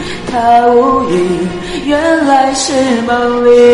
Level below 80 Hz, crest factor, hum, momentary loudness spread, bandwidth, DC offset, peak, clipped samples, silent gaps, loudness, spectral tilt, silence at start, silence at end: -36 dBFS; 10 dB; none; 9 LU; 11.5 kHz; under 0.1%; 0 dBFS; under 0.1%; none; -10 LUFS; -4.5 dB/octave; 0 s; 0 s